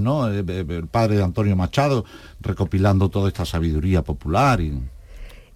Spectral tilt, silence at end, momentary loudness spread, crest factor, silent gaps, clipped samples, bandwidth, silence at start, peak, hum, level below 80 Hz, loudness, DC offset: -7.5 dB/octave; 0.15 s; 10 LU; 14 dB; none; under 0.1%; 14 kHz; 0 s; -6 dBFS; none; -34 dBFS; -21 LUFS; under 0.1%